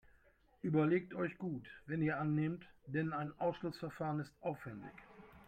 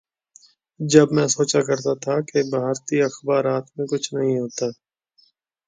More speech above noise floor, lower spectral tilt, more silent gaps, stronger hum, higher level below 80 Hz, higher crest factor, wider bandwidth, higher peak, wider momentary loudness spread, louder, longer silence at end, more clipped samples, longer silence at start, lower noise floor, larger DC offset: second, 31 dB vs 41 dB; first, -9 dB/octave vs -5 dB/octave; neither; neither; second, -70 dBFS vs -64 dBFS; about the same, 18 dB vs 22 dB; about the same, 8.8 kHz vs 9.6 kHz; second, -22 dBFS vs 0 dBFS; first, 14 LU vs 10 LU; second, -39 LUFS vs -21 LUFS; second, 0 s vs 0.95 s; neither; second, 0.65 s vs 0.8 s; first, -70 dBFS vs -62 dBFS; neither